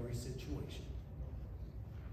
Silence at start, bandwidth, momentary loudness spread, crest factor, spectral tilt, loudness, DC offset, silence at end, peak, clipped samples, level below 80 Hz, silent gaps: 0 s; 15 kHz; 5 LU; 14 dB; -6.5 dB/octave; -47 LUFS; under 0.1%; 0 s; -32 dBFS; under 0.1%; -50 dBFS; none